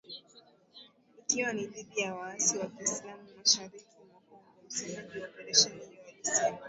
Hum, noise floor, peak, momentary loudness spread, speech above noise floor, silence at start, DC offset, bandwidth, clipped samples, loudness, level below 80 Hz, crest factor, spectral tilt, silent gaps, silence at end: none; -61 dBFS; -8 dBFS; 22 LU; 28 dB; 0.1 s; under 0.1%; 8.2 kHz; under 0.1%; -30 LUFS; -78 dBFS; 26 dB; -0.5 dB/octave; none; 0 s